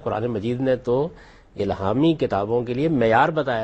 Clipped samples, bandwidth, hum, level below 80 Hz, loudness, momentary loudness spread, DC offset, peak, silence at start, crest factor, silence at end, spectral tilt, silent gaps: under 0.1%; 8.4 kHz; none; -50 dBFS; -22 LUFS; 9 LU; under 0.1%; -4 dBFS; 0 s; 18 dB; 0 s; -8 dB/octave; none